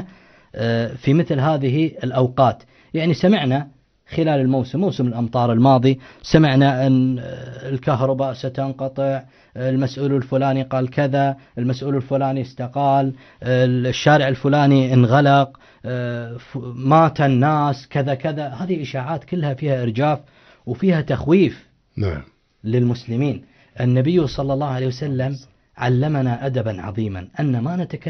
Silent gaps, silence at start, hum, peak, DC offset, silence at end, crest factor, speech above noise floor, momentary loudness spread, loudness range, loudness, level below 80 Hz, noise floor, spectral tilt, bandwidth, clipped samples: none; 0 s; none; -2 dBFS; under 0.1%; 0 s; 18 dB; 28 dB; 12 LU; 5 LU; -19 LUFS; -50 dBFS; -46 dBFS; -8 dB/octave; 6.4 kHz; under 0.1%